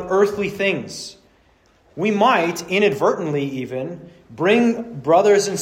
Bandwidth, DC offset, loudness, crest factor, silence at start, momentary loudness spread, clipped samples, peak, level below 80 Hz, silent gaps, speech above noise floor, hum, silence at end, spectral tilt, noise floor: 16 kHz; under 0.1%; -19 LUFS; 16 dB; 0 s; 16 LU; under 0.1%; -4 dBFS; -58 dBFS; none; 38 dB; none; 0 s; -5 dB/octave; -56 dBFS